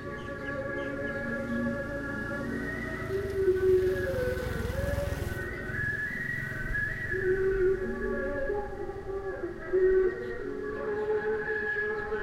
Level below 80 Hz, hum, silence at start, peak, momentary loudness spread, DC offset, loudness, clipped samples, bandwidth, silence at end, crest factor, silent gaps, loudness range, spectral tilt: -44 dBFS; none; 0 s; -16 dBFS; 10 LU; under 0.1%; -31 LUFS; under 0.1%; 16 kHz; 0 s; 14 dB; none; 2 LU; -7 dB/octave